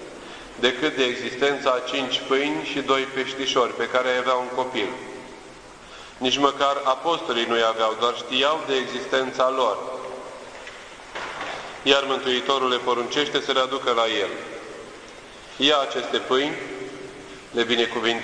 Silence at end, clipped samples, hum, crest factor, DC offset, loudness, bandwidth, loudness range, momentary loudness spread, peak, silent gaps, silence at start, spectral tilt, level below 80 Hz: 0 s; under 0.1%; none; 22 dB; under 0.1%; -23 LUFS; 10.5 kHz; 3 LU; 18 LU; -2 dBFS; none; 0 s; -2.5 dB/octave; -60 dBFS